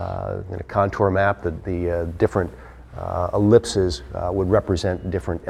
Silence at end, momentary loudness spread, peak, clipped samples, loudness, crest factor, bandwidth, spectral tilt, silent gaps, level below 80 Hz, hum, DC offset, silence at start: 0 s; 12 LU; -2 dBFS; under 0.1%; -22 LUFS; 20 dB; 11.5 kHz; -6.5 dB/octave; none; -38 dBFS; none; under 0.1%; 0 s